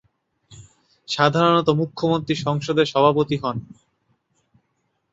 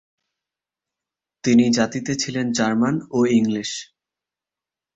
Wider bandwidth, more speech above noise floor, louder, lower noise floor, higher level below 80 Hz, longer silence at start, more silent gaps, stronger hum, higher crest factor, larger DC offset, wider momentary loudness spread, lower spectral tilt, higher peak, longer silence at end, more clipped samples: about the same, 8 kHz vs 8 kHz; second, 52 dB vs 70 dB; about the same, -20 LUFS vs -20 LUFS; second, -72 dBFS vs -89 dBFS; about the same, -58 dBFS vs -60 dBFS; second, 0.5 s vs 1.45 s; neither; neither; about the same, 20 dB vs 18 dB; neither; about the same, 9 LU vs 10 LU; first, -6 dB/octave vs -4.5 dB/octave; about the same, -2 dBFS vs -4 dBFS; first, 1.5 s vs 1.1 s; neither